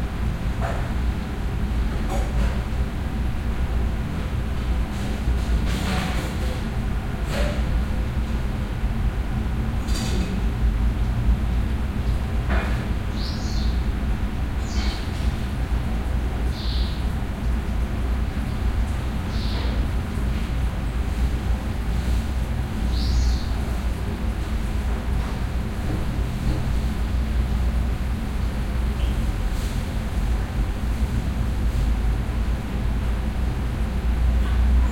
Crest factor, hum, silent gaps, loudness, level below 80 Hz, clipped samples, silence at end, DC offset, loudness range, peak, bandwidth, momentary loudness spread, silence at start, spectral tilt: 12 dB; none; none; -26 LUFS; -24 dBFS; under 0.1%; 0 s; under 0.1%; 1 LU; -10 dBFS; 15.5 kHz; 3 LU; 0 s; -6.5 dB/octave